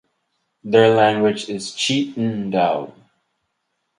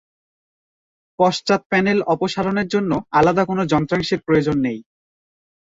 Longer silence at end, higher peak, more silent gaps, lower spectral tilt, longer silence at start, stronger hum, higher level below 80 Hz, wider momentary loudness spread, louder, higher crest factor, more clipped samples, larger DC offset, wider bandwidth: first, 1.1 s vs 0.95 s; about the same, 0 dBFS vs -2 dBFS; second, none vs 1.66-1.70 s; about the same, -5 dB/octave vs -6 dB/octave; second, 0.65 s vs 1.2 s; neither; second, -62 dBFS vs -50 dBFS; first, 13 LU vs 4 LU; about the same, -18 LUFS vs -19 LUFS; about the same, 20 dB vs 18 dB; neither; neither; first, 11 kHz vs 7.8 kHz